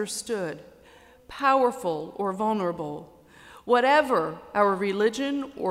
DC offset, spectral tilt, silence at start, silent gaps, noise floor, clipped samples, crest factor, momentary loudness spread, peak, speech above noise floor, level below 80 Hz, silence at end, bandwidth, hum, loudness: under 0.1%; -4.5 dB/octave; 0 s; none; -53 dBFS; under 0.1%; 18 dB; 15 LU; -8 dBFS; 28 dB; -64 dBFS; 0 s; 15.5 kHz; none; -25 LUFS